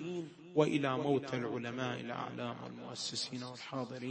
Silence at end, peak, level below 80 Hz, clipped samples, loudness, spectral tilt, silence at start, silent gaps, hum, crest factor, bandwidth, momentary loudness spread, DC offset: 0 s; -16 dBFS; -78 dBFS; under 0.1%; -37 LUFS; -5 dB/octave; 0 s; none; none; 22 dB; 8.4 kHz; 11 LU; under 0.1%